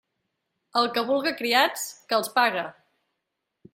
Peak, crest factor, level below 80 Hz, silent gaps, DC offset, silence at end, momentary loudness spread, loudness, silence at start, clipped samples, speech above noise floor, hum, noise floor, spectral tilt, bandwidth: -6 dBFS; 20 dB; -76 dBFS; none; under 0.1%; 1.05 s; 10 LU; -24 LUFS; 0.75 s; under 0.1%; 57 dB; none; -82 dBFS; -2 dB/octave; 16 kHz